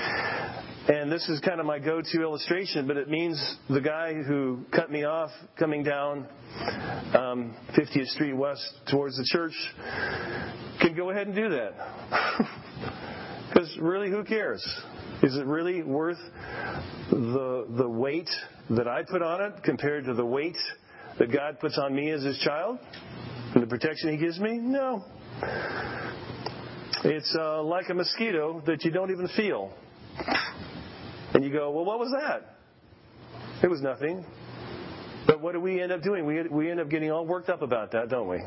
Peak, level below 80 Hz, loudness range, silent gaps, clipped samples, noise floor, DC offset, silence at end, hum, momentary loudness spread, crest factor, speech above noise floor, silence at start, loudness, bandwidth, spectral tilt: -2 dBFS; -58 dBFS; 2 LU; none; under 0.1%; -56 dBFS; under 0.1%; 0 s; none; 12 LU; 26 dB; 27 dB; 0 s; -29 LUFS; 5.8 kHz; -9 dB/octave